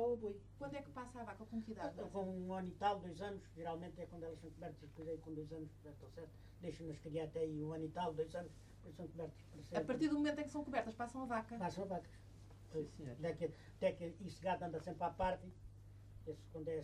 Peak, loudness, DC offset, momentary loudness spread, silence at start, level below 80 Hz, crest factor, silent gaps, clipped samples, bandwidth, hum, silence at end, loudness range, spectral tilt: -26 dBFS; -45 LUFS; under 0.1%; 15 LU; 0 s; -64 dBFS; 18 dB; none; under 0.1%; 13 kHz; none; 0 s; 7 LU; -6.5 dB/octave